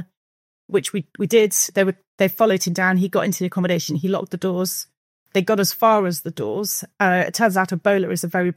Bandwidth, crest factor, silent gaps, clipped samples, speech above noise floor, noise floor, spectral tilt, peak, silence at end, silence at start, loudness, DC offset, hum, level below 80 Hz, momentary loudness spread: 16.5 kHz; 16 dB; 0.17-0.69 s, 2.07-2.18 s, 4.97-5.26 s; under 0.1%; over 70 dB; under -90 dBFS; -4.5 dB/octave; -4 dBFS; 0.05 s; 0 s; -20 LUFS; under 0.1%; none; -74 dBFS; 8 LU